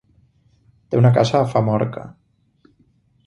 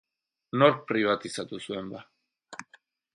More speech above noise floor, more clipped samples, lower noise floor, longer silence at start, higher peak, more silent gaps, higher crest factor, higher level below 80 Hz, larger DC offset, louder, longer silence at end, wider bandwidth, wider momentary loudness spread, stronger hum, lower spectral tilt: first, 42 dB vs 35 dB; neither; about the same, -59 dBFS vs -62 dBFS; first, 0.9 s vs 0.55 s; first, -2 dBFS vs -6 dBFS; neither; second, 18 dB vs 24 dB; first, -54 dBFS vs -72 dBFS; neither; first, -18 LUFS vs -27 LUFS; first, 1.15 s vs 0.5 s; second, 8.2 kHz vs 11.5 kHz; second, 17 LU vs 22 LU; neither; first, -7.5 dB/octave vs -5.5 dB/octave